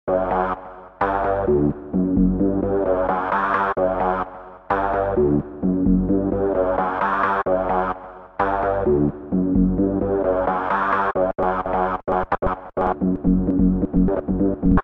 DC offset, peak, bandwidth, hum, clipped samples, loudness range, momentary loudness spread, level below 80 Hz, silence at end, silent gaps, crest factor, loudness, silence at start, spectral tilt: under 0.1%; -4 dBFS; 4.4 kHz; none; under 0.1%; 1 LU; 5 LU; -34 dBFS; 0 s; none; 16 dB; -21 LUFS; 0.05 s; -10.5 dB/octave